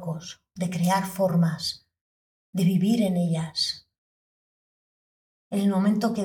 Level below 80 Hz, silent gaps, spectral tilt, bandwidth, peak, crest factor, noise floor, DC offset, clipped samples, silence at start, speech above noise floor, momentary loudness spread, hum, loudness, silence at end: -66 dBFS; 2.01-2.53 s, 3.98-5.51 s; -6 dB/octave; 19 kHz; -12 dBFS; 14 dB; under -90 dBFS; under 0.1%; under 0.1%; 0 s; over 66 dB; 12 LU; none; -25 LUFS; 0 s